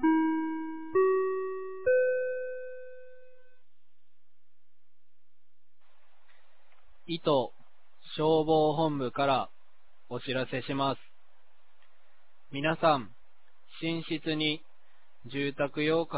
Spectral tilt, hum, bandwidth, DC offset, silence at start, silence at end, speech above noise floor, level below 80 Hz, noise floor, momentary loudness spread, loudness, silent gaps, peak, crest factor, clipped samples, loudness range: -4 dB/octave; none; 4 kHz; 0.8%; 0 s; 0 s; 54 dB; -68 dBFS; -83 dBFS; 15 LU; -30 LUFS; none; -12 dBFS; 20 dB; under 0.1%; 7 LU